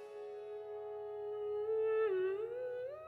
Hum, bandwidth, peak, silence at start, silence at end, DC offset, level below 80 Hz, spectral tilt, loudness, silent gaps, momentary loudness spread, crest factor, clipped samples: none; 4.5 kHz; -26 dBFS; 0 s; 0 s; under 0.1%; -82 dBFS; -7 dB/octave; -39 LUFS; none; 13 LU; 12 dB; under 0.1%